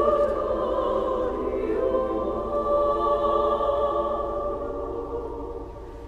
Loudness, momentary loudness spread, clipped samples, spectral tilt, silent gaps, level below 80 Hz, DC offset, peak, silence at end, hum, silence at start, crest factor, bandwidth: -25 LUFS; 10 LU; under 0.1%; -7.5 dB/octave; none; -40 dBFS; under 0.1%; -8 dBFS; 0 s; none; 0 s; 16 dB; 7.8 kHz